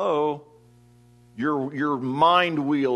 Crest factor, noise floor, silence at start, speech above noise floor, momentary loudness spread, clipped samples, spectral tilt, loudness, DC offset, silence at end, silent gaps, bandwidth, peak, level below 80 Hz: 18 dB; -54 dBFS; 0 s; 32 dB; 10 LU; under 0.1%; -6.5 dB/octave; -23 LUFS; under 0.1%; 0 s; none; 10.5 kHz; -6 dBFS; -68 dBFS